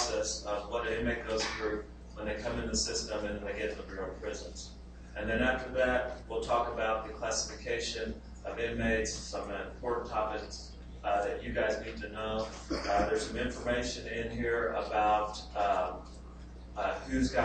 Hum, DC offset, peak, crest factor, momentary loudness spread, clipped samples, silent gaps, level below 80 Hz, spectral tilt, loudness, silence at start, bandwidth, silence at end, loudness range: none; under 0.1%; -16 dBFS; 18 dB; 12 LU; under 0.1%; none; -46 dBFS; -3.5 dB/octave; -34 LUFS; 0 s; 8.8 kHz; 0 s; 3 LU